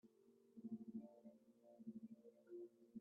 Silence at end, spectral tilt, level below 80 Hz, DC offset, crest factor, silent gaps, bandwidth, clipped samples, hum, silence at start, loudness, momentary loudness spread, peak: 0 s; -10.5 dB/octave; under -90 dBFS; under 0.1%; 18 dB; none; 2.6 kHz; under 0.1%; none; 0.05 s; -59 LUFS; 12 LU; -42 dBFS